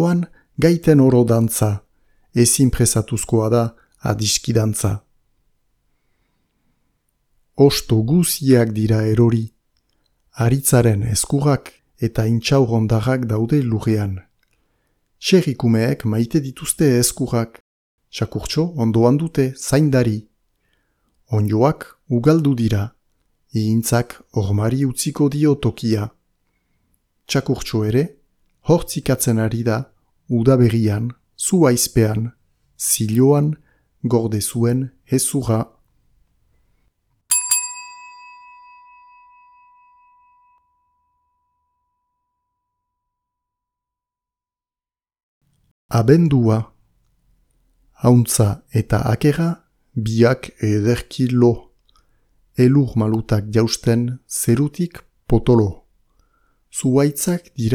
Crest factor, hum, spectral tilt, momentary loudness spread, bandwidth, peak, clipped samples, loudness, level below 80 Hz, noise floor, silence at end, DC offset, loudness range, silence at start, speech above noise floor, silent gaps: 18 dB; none; -5.5 dB/octave; 11 LU; 19 kHz; 0 dBFS; under 0.1%; -18 LUFS; -42 dBFS; under -90 dBFS; 0 s; under 0.1%; 5 LU; 0 s; over 73 dB; 17.60-17.98 s, 45.23-45.41 s, 45.71-45.89 s